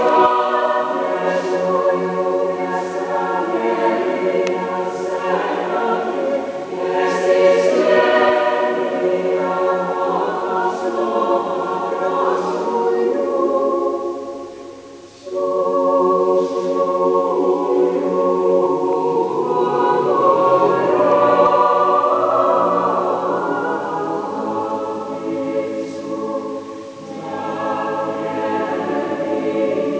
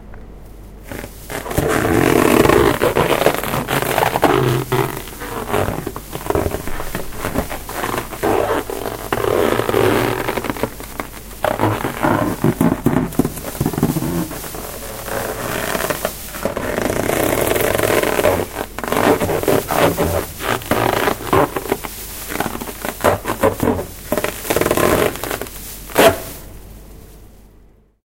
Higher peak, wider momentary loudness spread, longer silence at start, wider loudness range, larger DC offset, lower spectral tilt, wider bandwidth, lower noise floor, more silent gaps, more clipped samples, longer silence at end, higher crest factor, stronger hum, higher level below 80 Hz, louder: about the same, -2 dBFS vs 0 dBFS; second, 10 LU vs 13 LU; about the same, 0 s vs 0 s; about the same, 8 LU vs 6 LU; neither; about the same, -6 dB/octave vs -5 dB/octave; second, 8 kHz vs 17 kHz; second, -38 dBFS vs -48 dBFS; neither; neither; second, 0 s vs 0.8 s; about the same, 16 dB vs 18 dB; neither; second, -64 dBFS vs -34 dBFS; about the same, -18 LUFS vs -18 LUFS